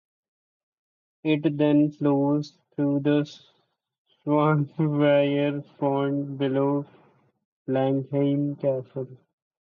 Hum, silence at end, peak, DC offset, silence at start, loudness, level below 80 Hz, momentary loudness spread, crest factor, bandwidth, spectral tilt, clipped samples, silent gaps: none; 0.55 s; -10 dBFS; under 0.1%; 1.25 s; -24 LUFS; -74 dBFS; 14 LU; 16 dB; 6.8 kHz; -9 dB/octave; under 0.1%; 3.98-4.05 s, 7.45-7.65 s